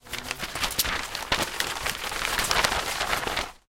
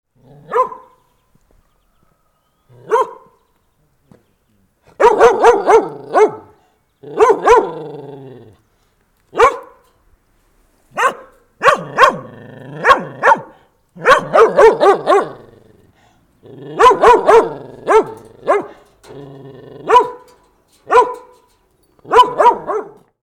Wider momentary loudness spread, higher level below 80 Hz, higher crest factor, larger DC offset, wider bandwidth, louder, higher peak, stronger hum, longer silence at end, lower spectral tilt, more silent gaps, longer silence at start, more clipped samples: second, 7 LU vs 20 LU; about the same, -44 dBFS vs -46 dBFS; first, 22 dB vs 16 dB; neither; first, 17 kHz vs 14 kHz; second, -26 LUFS vs -12 LUFS; second, -6 dBFS vs 0 dBFS; neither; second, 0.1 s vs 0.5 s; second, -1 dB/octave vs -4 dB/octave; neither; second, 0.05 s vs 0.5 s; neither